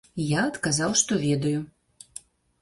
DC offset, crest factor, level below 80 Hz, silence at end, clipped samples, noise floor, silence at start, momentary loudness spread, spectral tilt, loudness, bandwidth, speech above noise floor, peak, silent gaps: under 0.1%; 20 dB; -58 dBFS; 0.95 s; under 0.1%; -48 dBFS; 0.15 s; 21 LU; -4 dB/octave; -24 LUFS; 11.5 kHz; 23 dB; -8 dBFS; none